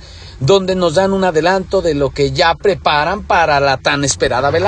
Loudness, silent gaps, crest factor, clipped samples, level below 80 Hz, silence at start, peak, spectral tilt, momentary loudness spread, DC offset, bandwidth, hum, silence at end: -14 LUFS; none; 14 dB; under 0.1%; -36 dBFS; 0 s; 0 dBFS; -4.5 dB/octave; 3 LU; under 0.1%; 10.5 kHz; none; 0 s